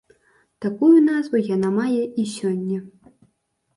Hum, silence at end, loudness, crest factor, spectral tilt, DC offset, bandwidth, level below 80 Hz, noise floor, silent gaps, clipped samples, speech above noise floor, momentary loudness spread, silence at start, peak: none; 0.9 s; -20 LUFS; 16 dB; -7 dB/octave; under 0.1%; 11.5 kHz; -68 dBFS; -70 dBFS; none; under 0.1%; 51 dB; 14 LU; 0.6 s; -6 dBFS